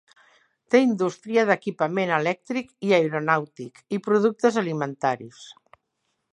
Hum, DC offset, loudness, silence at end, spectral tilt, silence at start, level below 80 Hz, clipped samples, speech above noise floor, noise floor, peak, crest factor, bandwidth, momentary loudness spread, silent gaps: none; under 0.1%; -23 LUFS; 0.8 s; -6 dB/octave; 0.7 s; -76 dBFS; under 0.1%; 53 dB; -76 dBFS; -4 dBFS; 20 dB; 11 kHz; 11 LU; none